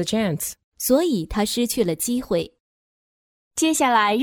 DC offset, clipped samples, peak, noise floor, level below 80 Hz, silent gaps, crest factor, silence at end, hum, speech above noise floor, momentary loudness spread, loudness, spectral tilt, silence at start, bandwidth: under 0.1%; under 0.1%; -6 dBFS; under -90 dBFS; -48 dBFS; 0.64-0.72 s, 2.60-3.51 s; 16 dB; 0 s; none; over 69 dB; 10 LU; -22 LUFS; -3.5 dB/octave; 0 s; over 20 kHz